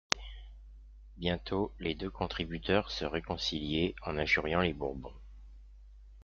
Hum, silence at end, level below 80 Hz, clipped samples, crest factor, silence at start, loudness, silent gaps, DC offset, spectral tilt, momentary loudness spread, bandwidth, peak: none; 0 s; -48 dBFS; under 0.1%; 34 dB; 0.1 s; -34 LUFS; none; under 0.1%; -3 dB/octave; 17 LU; 7.6 kHz; 0 dBFS